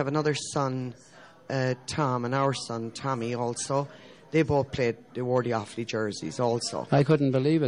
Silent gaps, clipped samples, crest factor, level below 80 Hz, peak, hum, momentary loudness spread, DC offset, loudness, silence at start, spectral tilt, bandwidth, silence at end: none; under 0.1%; 16 dB; -58 dBFS; -12 dBFS; none; 9 LU; under 0.1%; -28 LUFS; 0 s; -5.5 dB/octave; 11 kHz; 0 s